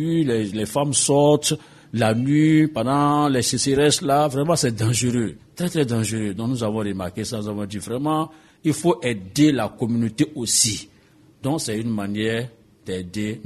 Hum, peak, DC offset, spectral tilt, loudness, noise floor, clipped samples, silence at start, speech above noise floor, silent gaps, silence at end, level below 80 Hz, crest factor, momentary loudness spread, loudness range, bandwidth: none; -4 dBFS; under 0.1%; -4.5 dB/octave; -21 LUFS; -53 dBFS; under 0.1%; 0 s; 32 dB; none; 0 s; -54 dBFS; 18 dB; 11 LU; 6 LU; 13.5 kHz